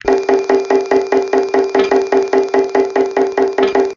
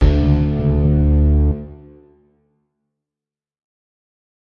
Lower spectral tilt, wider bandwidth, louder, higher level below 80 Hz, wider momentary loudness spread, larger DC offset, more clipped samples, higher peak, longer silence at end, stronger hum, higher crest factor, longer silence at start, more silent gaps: second, -4 dB/octave vs -10.5 dB/octave; first, 7.4 kHz vs 5.4 kHz; about the same, -14 LUFS vs -16 LUFS; second, -50 dBFS vs -22 dBFS; second, 1 LU vs 9 LU; neither; neither; about the same, 0 dBFS vs -2 dBFS; second, 0 s vs 2.75 s; neither; about the same, 14 dB vs 16 dB; about the same, 0.05 s vs 0 s; neither